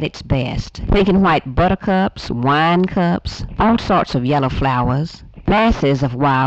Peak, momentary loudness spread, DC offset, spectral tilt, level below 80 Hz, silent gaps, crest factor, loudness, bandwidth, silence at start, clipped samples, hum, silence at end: -4 dBFS; 8 LU; under 0.1%; -7.5 dB/octave; -30 dBFS; none; 12 dB; -17 LUFS; 8 kHz; 0 s; under 0.1%; none; 0 s